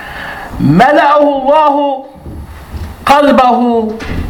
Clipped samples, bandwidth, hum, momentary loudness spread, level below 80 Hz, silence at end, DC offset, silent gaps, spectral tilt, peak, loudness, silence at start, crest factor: 0.6%; 18 kHz; none; 21 LU; -30 dBFS; 0 s; under 0.1%; none; -6.5 dB/octave; 0 dBFS; -9 LUFS; 0 s; 10 dB